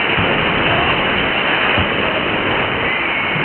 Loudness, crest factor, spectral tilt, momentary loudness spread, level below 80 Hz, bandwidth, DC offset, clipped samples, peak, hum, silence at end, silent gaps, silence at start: -15 LUFS; 14 dB; -10 dB/octave; 2 LU; -36 dBFS; 4.4 kHz; under 0.1%; under 0.1%; -2 dBFS; none; 0 s; none; 0 s